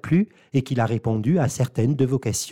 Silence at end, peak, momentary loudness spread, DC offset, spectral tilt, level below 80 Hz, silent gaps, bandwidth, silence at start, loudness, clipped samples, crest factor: 0 s; -10 dBFS; 3 LU; 0.2%; -6.5 dB/octave; -52 dBFS; none; 17 kHz; 0.05 s; -23 LUFS; under 0.1%; 12 dB